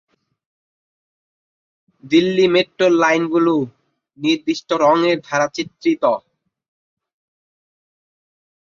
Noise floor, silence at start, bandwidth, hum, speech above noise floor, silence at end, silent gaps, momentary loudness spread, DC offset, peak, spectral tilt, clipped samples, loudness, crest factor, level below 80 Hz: under -90 dBFS; 2.05 s; 7.4 kHz; none; over 74 dB; 2.45 s; none; 7 LU; under 0.1%; -2 dBFS; -5 dB/octave; under 0.1%; -17 LUFS; 18 dB; -64 dBFS